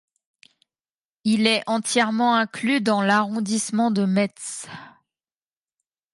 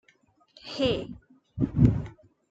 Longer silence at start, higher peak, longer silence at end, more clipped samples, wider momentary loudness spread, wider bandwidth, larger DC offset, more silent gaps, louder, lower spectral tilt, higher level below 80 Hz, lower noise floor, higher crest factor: first, 1.25 s vs 0.65 s; about the same, -6 dBFS vs -6 dBFS; first, 1.25 s vs 0.4 s; neither; second, 13 LU vs 23 LU; first, 11.5 kHz vs 7.8 kHz; neither; neither; first, -21 LUFS vs -27 LUFS; second, -4 dB/octave vs -8 dB/octave; second, -72 dBFS vs -42 dBFS; first, under -90 dBFS vs -64 dBFS; second, 18 dB vs 24 dB